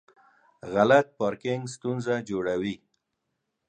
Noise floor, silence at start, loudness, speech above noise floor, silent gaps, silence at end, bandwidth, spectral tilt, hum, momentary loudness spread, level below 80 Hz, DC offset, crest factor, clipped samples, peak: -80 dBFS; 0.65 s; -26 LUFS; 55 dB; none; 0.95 s; 9.8 kHz; -6 dB/octave; none; 13 LU; -64 dBFS; under 0.1%; 22 dB; under 0.1%; -6 dBFS